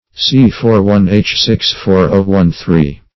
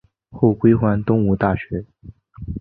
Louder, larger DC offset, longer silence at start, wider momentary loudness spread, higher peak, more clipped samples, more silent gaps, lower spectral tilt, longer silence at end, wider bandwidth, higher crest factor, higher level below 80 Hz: first, -11 LUFS vs -18 LUFS; first, 0.9% vs under 0.1%; second, 0.15 s vs 0.35 s; second, 3 LU vs 15 LU; about the same, 0 dBFS vs -2 dBFS; first, 0.4% vs under 0.1%; neither; second, -6.5 dB/octave vs -13 dB/octave; first, 0.2 s vs 0 s; first, 6 kHz vs 4.3 kHz; second, 10 dB vs 18 dB; first, -30 dBFS vs -40 dBFS